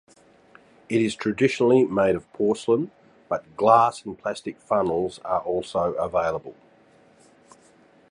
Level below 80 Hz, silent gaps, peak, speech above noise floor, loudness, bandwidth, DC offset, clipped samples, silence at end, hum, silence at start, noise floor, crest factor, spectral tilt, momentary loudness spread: -58 dBFS; none; -2 dBFS; 33 dB; -23 LUFS; 11 kHz; under 0.1%; under 0.1%; 1.6 s; none; 0.9 s; -56 dBFS; 22 dB; -6 dB/octave; 12 LU